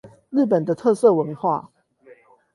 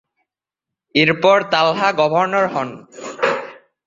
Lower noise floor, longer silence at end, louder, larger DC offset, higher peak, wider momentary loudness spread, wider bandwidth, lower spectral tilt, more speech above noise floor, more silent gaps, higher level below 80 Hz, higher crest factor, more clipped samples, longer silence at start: second, -51 dBFS vs -85 dBFS; first, 0.9 s vs 0.3 s; second, -20 LUFS vs -16 LUFS; neither; about the same, -4 dBFS vs -2 dBFS; second, 8 LU vs 16 LU; first, 11.5 kHz vs 7.6 kHz; first, -8 dB/octave vs -5 dB/octave; second, 32 dB vs 68 dB; neither; second, -68 dBFS vs -60 dBFS; about the same, 18 dB vs 18 dB; neither; second, 0.05 s vs 0.95 s